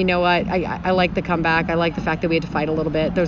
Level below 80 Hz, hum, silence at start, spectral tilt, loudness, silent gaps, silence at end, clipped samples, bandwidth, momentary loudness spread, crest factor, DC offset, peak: -38 dBFS; none; 0 s; -7.5 dB/octave; -20 LUFS; none; 0 s; under 0.1%; 7.6 kHz; 4 LU; 16 dB; under 0.1%; -4 dBFS